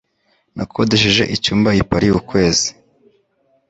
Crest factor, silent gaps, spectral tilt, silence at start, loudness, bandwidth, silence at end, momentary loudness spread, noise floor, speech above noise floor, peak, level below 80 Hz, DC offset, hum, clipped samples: 16 dB; none; -4 dB/octave; 0.55 s; -15 LUFS; 8.2 kHz; 1 s; 11 LU; -63 dBFS; 47 dB; -2 dBFS; -38 dBFS; under 0.1%; none; under 0.1%